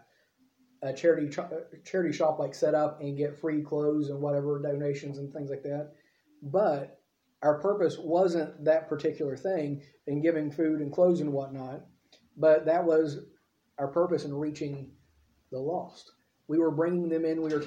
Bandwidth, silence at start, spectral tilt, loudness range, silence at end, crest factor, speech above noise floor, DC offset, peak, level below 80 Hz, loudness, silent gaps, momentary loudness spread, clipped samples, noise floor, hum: 9.2 kHz; 0.8 s; -7.5 dB/octave; 4 LU; 0 s; 18 dB; 40 dB; under 0.1%; -12 dBFS; -74 dBFS; -29 LUFS; none; 14 LU; under 0.1%; -69 dBFS; none